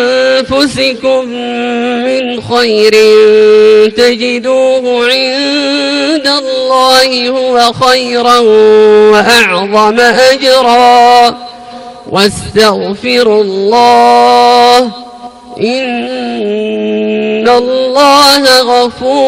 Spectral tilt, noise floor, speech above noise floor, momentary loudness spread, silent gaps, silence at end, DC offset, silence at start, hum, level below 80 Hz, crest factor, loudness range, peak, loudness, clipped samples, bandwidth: -3 dB/octave; -27 dBFS; 20 dB; 10 LU; none; 0 s; under 0.1%; 0 s; none; -44 dBFS; 8 dB; 4 LU; 0 dBFS; -7 LUFS; 2%; 16 kHz